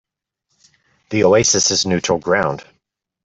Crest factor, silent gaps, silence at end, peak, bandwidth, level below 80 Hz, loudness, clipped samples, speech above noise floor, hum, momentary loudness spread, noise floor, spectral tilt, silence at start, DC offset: 16 dB; none; 0.6 s; -2 dBFS; 8.4 kHz; -54 dBFS; -15 LUFS; under 0.1%; 58 dB; none; 11 LU; -74 dBFS; -3 dB/octave; 1.1 s; under 0.1%